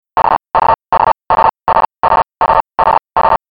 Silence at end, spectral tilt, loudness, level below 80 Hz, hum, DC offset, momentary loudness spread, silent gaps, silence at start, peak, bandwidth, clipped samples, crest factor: 0.15 s; -10 dB/octave; -12 LUFS; -36 dBFS; none; under 0.1%; 1 LU; none; 0.15 s; -2 dBFS; 5.2 kHz; under 0.1%; 12 dB